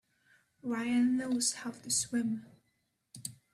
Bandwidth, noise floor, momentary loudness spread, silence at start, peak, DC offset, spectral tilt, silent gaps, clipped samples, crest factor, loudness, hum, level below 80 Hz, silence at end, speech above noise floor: 14.5 kHz; -78 dBFS; 15 LU; 0.65 s; -18 dBFS; under 0.1%; -2.5 dB/octave; none; under 0.1%; 18 dB; -32 LUFS; none; -76 dBFS; 0.2 s; 46 dB